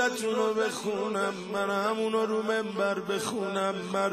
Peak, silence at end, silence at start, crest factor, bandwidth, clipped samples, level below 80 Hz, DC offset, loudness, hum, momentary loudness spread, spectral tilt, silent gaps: -14 dBFS; 0 s; 0 s; 14 dB; 15.5 kHz; under 0.1%; -76 dBFS; under 0.1%; -29 LUFS; none; 3 LU; -4 dB/octave; none